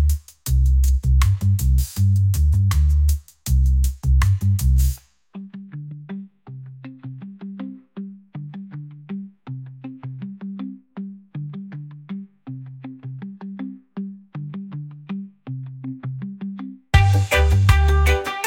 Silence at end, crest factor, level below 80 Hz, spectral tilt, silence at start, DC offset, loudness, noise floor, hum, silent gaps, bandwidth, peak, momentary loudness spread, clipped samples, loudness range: 0 s; 18 dB; -24 dBFS; -6 dB/octave; 0 s; under 0.1%; -20 LUFS; -39 dBFS; none; none; 17 kHz; -2 dBFS; 19 LU; under 0.1%; 16 LU